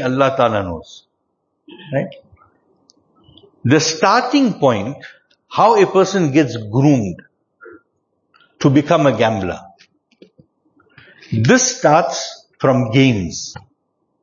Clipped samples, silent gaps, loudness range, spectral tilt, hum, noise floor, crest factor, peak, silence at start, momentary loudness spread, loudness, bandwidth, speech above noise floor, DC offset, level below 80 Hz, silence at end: under 0.1%; none; 6 LU; -5 dB/octave; none; -70 dBFS; 18 dB; 0 dBFS; 0 s; 15 LU; -15 LUFS; 7.4 kHz; 55 dB; under 0.1%; -52 dBFS; 0.65 s